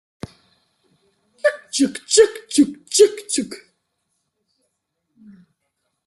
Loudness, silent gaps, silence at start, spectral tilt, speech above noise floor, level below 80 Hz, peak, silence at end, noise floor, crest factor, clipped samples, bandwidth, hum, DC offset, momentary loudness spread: -18 LUFS; none; 1.45 s; -2.5 dB/octave; 57 dB; -62 dBFS; -2 dBFS; 2.5 s; -74 dBFS; 20 dB; under 0.1%; 12.5 kHz; none; under 0.1%; 24 LU